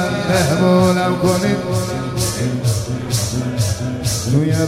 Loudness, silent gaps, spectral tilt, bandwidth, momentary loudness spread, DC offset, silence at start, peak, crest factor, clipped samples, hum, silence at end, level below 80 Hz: -17 LUFS; none; -5.5 dB/octave; 16.5 kHz; 7 LU; under 0.1%; 0 s; -2 dBFS; 16 dB; under 0.1%; none; 0 s; -38 dBFS